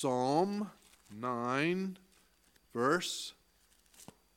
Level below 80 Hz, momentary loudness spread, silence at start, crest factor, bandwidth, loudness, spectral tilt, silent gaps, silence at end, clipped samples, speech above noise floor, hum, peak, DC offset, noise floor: -76 dBFS; 23 LU; 0 s; 20 dB; 17 kHz; -35 LUFS; -4.5 dB/octave; none; 0.3 s; under 0.1%; 36 dB; none; -16 dBFS; under 0.1%; -69 dBFS